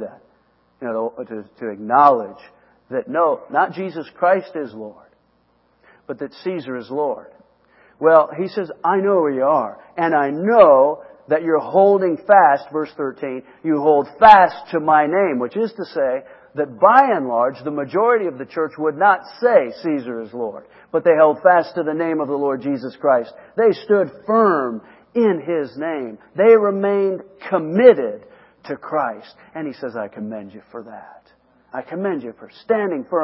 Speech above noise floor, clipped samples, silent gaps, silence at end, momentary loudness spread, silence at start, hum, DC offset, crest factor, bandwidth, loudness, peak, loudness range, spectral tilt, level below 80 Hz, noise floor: 43 dB; under 0.1%; none; 0 s; 18 LU; 0 s; none; under 0.1%; 18 dB; 5.8 kHz; -17 LUFS; 0 dBFS; 11 LU; -8.5 dB/octave; -64 dBFS; -61 dBFS